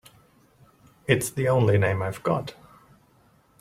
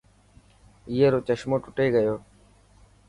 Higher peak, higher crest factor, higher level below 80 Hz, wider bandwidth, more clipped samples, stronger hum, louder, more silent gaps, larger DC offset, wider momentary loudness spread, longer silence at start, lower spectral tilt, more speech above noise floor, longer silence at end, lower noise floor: first, -4 dBFS vs -8 dBFS; first, 24 dB vs 18 dB; about the same, -58 dBFS vs -56 dBFS; first, 16 kHz vs 11 kHz; neither; second, none vs 50 Hz at -50 dBFS; about the same, -24 LUFS vs -24 LUFS; neither; neither; first, 11 LU vs 8 LU; first, 1.1 s vs 0.85 s; second, -6 dB/octave vs -7.5 dB/octave; first, 37 dB vs 33 dB; first, 1.1 s vs 0.9 s; first, -60 dBFS vs -56 dBFS